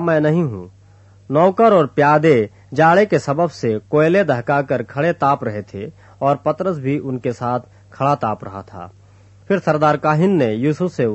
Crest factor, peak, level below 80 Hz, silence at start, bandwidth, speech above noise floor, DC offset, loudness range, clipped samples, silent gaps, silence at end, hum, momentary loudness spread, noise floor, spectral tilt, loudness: 16 dB; -2 dBFS; -56 dBFS; 0 s; 8.4 kHz; 30 dB; under 0.1%; 7 LU; under 0.1%; none; 0 s; none; 13 LU; -47 dBFS; -7.5 dB/octave; -17 LUFS